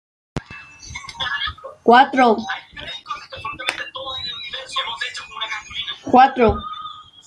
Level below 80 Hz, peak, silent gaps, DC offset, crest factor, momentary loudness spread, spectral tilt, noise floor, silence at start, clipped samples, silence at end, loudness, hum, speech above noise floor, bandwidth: -44 dBFS; 0 dBFS; none; under 0.1%; 20 dB; 20 LU; -4 dB/octave; -39 dBFS; 0.35 s; under 0.1%; 0.25 s; -19 LUFS; none; 25 dB; 11 kHz